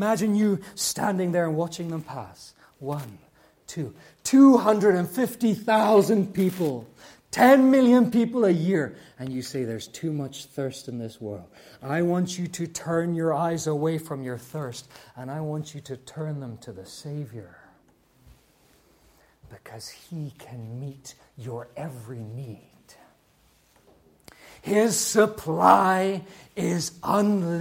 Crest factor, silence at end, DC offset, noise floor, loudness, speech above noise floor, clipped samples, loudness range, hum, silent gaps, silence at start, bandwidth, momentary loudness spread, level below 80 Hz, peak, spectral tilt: 22 dB; 0 s; under 0.1%; -62 dBFS; -23 LUFS; 38 dB; under 0.1%; 20 LU; none; none; 0 s; 16.5 kHz; 21 LU; -64 dBFS; -4 dBFS; -5.5 dB/octave